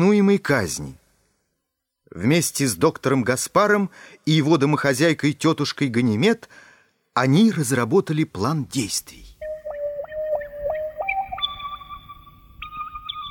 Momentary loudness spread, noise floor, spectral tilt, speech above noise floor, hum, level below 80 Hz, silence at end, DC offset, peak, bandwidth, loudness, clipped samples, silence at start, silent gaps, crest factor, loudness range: 15 LU; -78 dBFS; -5 dB/octave; 59 dB; none; -52 dBFS; 0 s; under 0.1%; -4 dBFS; 18 kHz; -21 LUFS; under 0.1%; 0 s; none; 18 dB; 9 LU